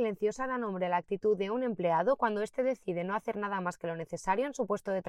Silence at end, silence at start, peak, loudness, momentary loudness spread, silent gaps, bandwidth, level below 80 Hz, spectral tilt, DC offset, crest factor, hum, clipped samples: 0 s; 0 s; -16 dBFS; -32 LUFS; 6 LU; none; 12.5 kHz; -64 dBFS; -6 dB/octave; under 0.1%; 16 dB; none; under 0.1%